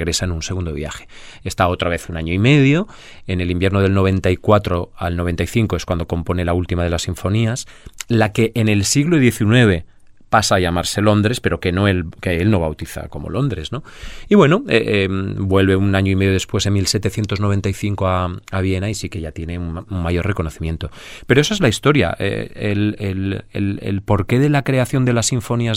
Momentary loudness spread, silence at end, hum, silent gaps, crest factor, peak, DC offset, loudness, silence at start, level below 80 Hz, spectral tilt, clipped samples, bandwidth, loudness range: 12 LU; 0 s; none; none; 18 dB; 0 dBFS; under 0.1%; -18 LUFS; 0 s; -36 dBFS; -5.5 dB/octave; under 0.1%; 15.5 kHz; 4 LU